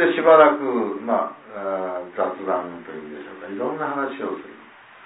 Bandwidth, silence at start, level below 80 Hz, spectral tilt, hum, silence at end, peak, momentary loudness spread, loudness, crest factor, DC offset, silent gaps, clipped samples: 4 kHz; 0 s; -72 dBFS; -9.5 dB/octave; none; 0 s; -2 dBFS; 22 LU; -21 LUFS; 20 dB; under 0.1%; none; under 0.1%